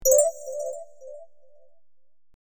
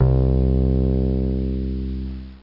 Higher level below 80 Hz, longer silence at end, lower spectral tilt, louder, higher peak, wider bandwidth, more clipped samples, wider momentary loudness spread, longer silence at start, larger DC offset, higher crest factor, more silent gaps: second, -56 dBFS vs -22 dBFS; first, 1.15 s vs 0.05 s; second, -0.5 dB/octave vs -12.5 dB/octave; second, -25 LUFS vs -21 LUFS; about the same, -6 dBFS vs -4 dBFS; first, over 20 kHz vs 5.2 kHz; neither; first, 25 LU vs 10 LU; about the same, 0 s vs 0 s; neither; first, 20 dB vs 14 dB; neither